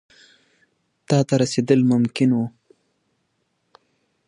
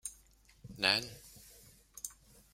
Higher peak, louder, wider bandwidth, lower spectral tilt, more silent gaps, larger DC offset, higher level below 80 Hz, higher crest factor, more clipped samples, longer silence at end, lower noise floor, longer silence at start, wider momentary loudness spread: first, -2 dBFS vs -10 dBFS; first, -20 LUFS vs -34 LUFS; second, 10.5 kHz vs 16 kHz; first, -6.5 dB/octave vs -1.5 dB/octave; neither; neither; about the same, -64 dBFS vs -66 dBFS; second, 20 dB vs 30 dB; neither; first, 1.8 s vs 0.4 s; first, -71 dBFS vs -64 dBFS; first, 1.1 s vs 0.05 s; second, 6 LU vs 25 LU